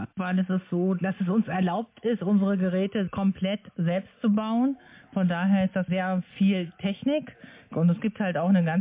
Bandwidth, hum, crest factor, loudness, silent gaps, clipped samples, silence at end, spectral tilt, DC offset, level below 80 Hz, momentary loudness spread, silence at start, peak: 3.8 kHz; none; 12 dB; -26 LUFS; none; under 0.1%; 0 s; -11.5 dB/octave; under 0.1%; -62 dBFS; 6 LU; 0 s; -14 dBFS